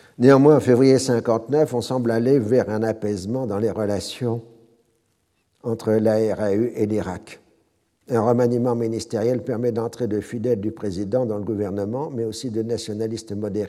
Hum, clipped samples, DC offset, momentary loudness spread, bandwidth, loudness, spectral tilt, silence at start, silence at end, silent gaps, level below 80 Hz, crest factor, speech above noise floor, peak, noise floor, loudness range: none; under 0.1%; under 0.1%; 12 LU; 14 kHz; -21 LUFS; -7 dB/octave; 0.2 s; 0 s; none; -62 dBFS; 20 dB; 48 dB; -2 dBFS; -68 dBFS; 6 LU